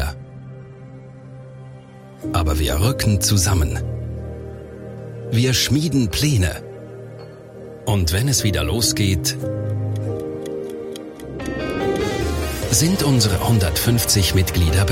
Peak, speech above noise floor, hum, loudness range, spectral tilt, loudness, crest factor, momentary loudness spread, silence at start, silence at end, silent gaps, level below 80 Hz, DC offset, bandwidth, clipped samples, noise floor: -4 dBFS; 22 dB; none; 5 LU; -4.5 dB/octave; -19 LUFS; 16 dB; 22 LU; 0 s; 0 s; none; -34 dBFS; under 0.1%; 16.5 kHz; under 0.1%; -40 dBFS